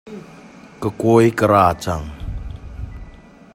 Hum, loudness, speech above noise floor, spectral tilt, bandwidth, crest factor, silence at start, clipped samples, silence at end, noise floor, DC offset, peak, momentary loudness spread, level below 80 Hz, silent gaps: none; -16 LUFS; 26 dB; -7 dB/octave; 16.5 kHz; 18 dB; 0.05 s; under 0.1%; 0.45 s; -42 dBFS; under 0.1%; 0 dBFS; 22 LU; -36 dBFS; none